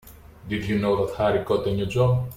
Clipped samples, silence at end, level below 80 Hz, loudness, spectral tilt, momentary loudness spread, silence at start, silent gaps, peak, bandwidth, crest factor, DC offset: under 0.1%; 0 s; -46 dBFS; -24 LUFS; -7.5 dB/octave; 6 LU; 0.05 s; none; -10 dBFS; 16 kHz; 14 dB; under 0.1%